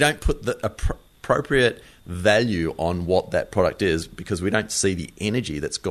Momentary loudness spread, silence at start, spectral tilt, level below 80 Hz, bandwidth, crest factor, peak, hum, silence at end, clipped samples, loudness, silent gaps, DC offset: 9 LU; 0 s; -4.5 dB/octave; -36 dBFS; 13.5 kHz; 20 dB; -4 dBFS; none; 0 s; under 0.1%; -23 LUFS; none; under 0.1%